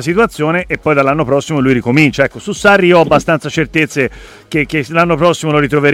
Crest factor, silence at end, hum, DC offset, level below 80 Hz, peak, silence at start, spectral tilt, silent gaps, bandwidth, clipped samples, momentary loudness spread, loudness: 12 dB; 0 s; none; under 0.1%; -38 dBFS; 0 dBFS; 0 s; -6 dB/octave; none; 16 kHz; under 0.1%; 7 LU; -12 LUFS